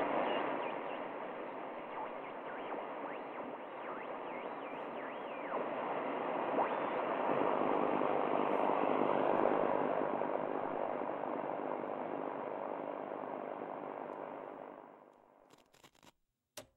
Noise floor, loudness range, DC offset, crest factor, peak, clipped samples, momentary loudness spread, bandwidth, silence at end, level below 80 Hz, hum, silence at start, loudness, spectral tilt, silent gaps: -70 dBFS; 11 LU; under 0.1%; 22 dB; -16 dBFS; under 0.1%; 12 LU; 13.5 kHz; 0.1 s; -82 dBFS; none; 0 s; -38 LUFS; -6.5 dB/octave; none